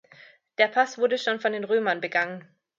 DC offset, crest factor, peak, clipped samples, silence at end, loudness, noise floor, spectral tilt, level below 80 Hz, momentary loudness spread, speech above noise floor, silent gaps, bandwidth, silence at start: under 0.1%; 20 dB; -6 dBFS; under 0.1%; 0.4 s; -25 LUFS; -53 dBFS; -3.5 dB/octave; -82 dBFS; 9 LU; 29 dB; none; 7.6 kHz; 0.6 s